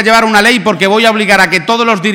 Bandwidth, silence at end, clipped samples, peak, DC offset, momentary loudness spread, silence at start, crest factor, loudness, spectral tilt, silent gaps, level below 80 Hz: 19.5 kHz; 0 s; 0.8%; 0 dBFS; under 0.1%; 3 LU; 0 s; 8 dB; -8 LUFS; -3.5 dB/octave; none; -44 dBFS